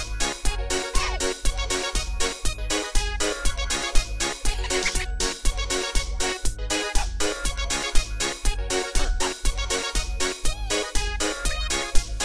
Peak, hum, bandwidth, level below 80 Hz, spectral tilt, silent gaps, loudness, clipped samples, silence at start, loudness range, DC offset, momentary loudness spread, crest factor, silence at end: -4 dBFS; none; 13.5 kHz; -28 dBFS; -2.5 dB/octave; none; -26 LUFS; under 0.1%; 0 s; 0 LU; under 0.1%; 3 LU; 20 dB; 0 s